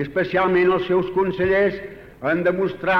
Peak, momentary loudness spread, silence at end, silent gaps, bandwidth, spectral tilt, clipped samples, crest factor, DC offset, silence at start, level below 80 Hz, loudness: -8 dBFS; 9 LU; 0 s; none; 5.8 kHz; -8 dB/octave; under 0.1%; 12 dB; under 0.1%; 0 s; -48 dBFS; -20 LUFS